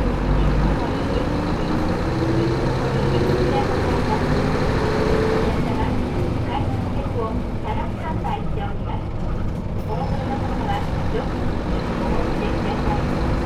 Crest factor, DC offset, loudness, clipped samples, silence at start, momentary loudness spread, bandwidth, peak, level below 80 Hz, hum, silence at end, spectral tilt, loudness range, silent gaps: 14 dB; under 0.1%; -22 LUFS; under 0.1%; 0 s; 6 LU; 13.5 kHz; -6 dBFS; -26 dBFS; none; 0 s; -7.5 dB/octave; 5 LU; none